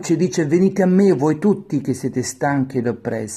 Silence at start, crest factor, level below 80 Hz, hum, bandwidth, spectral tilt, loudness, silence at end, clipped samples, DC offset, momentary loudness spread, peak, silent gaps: 0 s; 14 dB; -58 dBFS; none; 13 kHz; -6.5 dB/octave; -18 LUFS; 0 s; under 0.1%; under 0.1%; 8 LU; -4 dBFS; none